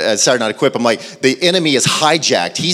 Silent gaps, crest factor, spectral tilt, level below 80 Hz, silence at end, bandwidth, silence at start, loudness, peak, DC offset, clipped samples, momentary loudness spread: none; 14 dB; -2.5 dB/octave; -60 dBFS; 0 s; 16 kHz; 0 s; -13 LUFS; 0 dBFS; under 0.1%; under 0.1%; 4 LU